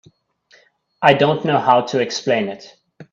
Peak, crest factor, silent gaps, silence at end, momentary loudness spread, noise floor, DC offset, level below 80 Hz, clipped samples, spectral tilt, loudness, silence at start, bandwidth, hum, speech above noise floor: 0 dBFS; 18 dB; none; 0.1 s; 8 LU; -55 dBFS; under 0.1%; -62 dBFS; under 0.1%; -5 dB/octave; -17 LUFS; 1 s; 7.6 kHz; none; 39 dB